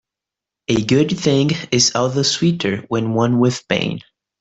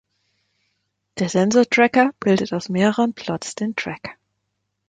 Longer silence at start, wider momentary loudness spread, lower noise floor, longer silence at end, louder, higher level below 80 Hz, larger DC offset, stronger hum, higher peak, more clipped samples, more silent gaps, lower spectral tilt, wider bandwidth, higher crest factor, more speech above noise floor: second, 0.7 s vs 1.15 s; second, 6 LU vs 14 LU; first, -86 dBFS vs -75 dBFS; second, 0.4 s vs 0.75 s; about the same, -17 LUFS vs -19 LUFS; first, -52 dBFS vs -62 dBFS; neither; second, none vs 50 Hz at -45 dBFS; about the same, -2 dBFS vs -2 dBFS; neither; neither; about the same, -4.5 dB/octave vs -5 dB/octave; second, 8.4 kHz vs 9.4 kHz; about the same, 16 dB vs 20 dB; first, 69 dB vs 56 dB